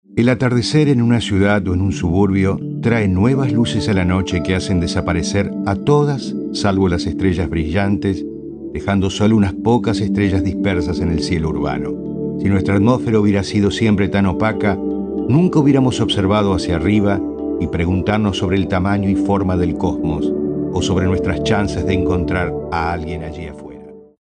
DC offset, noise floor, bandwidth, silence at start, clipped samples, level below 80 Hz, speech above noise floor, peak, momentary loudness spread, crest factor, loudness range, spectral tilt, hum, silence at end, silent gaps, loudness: under 0.1%; -37 dBFS; 10 kHz; 0.1 s; under 0.1%; -36 dBFS; 21 dB; -2 dBFS; 7 LU; 14 dB; 3 LU; -6.5 dB/octave; none; 0.2 s; none; -17 LUFS